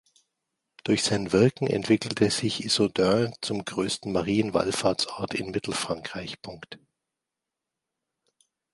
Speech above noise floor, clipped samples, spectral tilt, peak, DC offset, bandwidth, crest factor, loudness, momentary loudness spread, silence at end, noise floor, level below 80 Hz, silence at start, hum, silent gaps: 61 dB; under 0.1%; -4.5 dB/octave; -8 dBFS; under 0.1%; 11.5 kHz; 20 dB; -26 LUFS; 13 LU; 1.95 s; -87 dBFS; -58 dBFS; 0.85 s; none; none